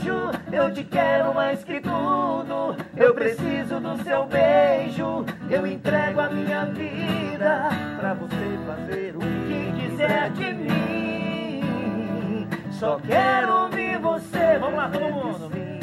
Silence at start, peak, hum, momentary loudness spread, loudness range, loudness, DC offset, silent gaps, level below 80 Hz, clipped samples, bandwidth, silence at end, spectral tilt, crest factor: 0 s; -4 dBFS; none; 9 LU; 4 LU; -24 LUFS; under 0.1%; none; -56 dBFS; under 0.1%; 13.5 kHz; 0 s; -7 dB/octave; 20 dB